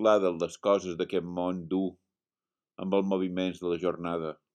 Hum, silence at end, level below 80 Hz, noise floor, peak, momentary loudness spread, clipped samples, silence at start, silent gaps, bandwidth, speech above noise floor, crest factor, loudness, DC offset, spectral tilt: none; 0.2 s; -68 dBFS; under -90 dBFS; -10 dBFS; 7 LU; under 0.1%; 0 s; none; 9.8 kHz; over 61 dB; 20 dB; -30 LUFS; under 0.1%; -6.5 dB/octave